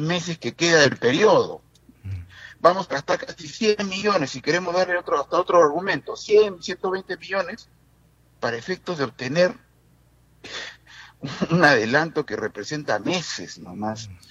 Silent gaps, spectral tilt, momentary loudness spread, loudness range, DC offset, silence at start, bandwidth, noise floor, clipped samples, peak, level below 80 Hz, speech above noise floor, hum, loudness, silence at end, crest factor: none; -4.5 dB/octave; 19 LU; 7 LU; under 0.1%; 0 s; 8.2 kHz; -58 dBFS; under 0.1%; -2 dBFS; -60 dBFS; 36 dB; none; -22 LUFS; 0.15 s; 22 dB